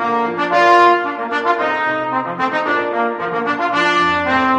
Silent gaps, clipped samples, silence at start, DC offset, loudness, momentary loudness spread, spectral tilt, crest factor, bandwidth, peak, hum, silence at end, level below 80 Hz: none; under 0.1%; 0 s; under 0.1%; -16 LUFS; 8 LU; -4.5 dB/octave; 16 dB; 9.6 kHz; 0 dBFS; none; 0 s; -56 dBFS